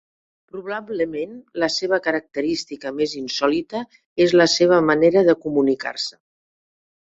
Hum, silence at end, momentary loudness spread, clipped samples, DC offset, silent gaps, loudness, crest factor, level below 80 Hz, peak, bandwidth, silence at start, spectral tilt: none; 0.9 s; 15 LU; under 0.1%; under 0.1%; 4.06-4.16 s; -20 LUFS; 18 dB; -60 dBFS; -2 dBFS; 8 kHz; 0.55 s; -4.5 dB/octave